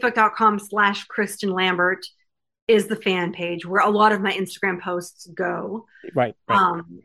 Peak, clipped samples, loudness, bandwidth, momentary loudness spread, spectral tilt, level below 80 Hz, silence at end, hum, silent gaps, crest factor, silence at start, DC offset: -4 dBFS; under 0.1%; -21 LUFS; 14.5 kHz; 12 LU; -4.5 dB/octave; -70 dBFS; 0.05 s; none; 2.62-2.67 s; 18 dB; 0 s; under 0.1%